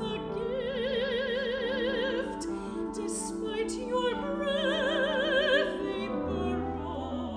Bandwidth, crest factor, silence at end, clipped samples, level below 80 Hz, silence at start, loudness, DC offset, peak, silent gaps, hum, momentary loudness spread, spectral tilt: 10.5 kHz; 16 dB; 0 s; under 0.1%; -50 dBFS; 0 s; -31 LUFS; under 0.1%; -14 dBFS; none; none; 8 LU; -4 dB/octave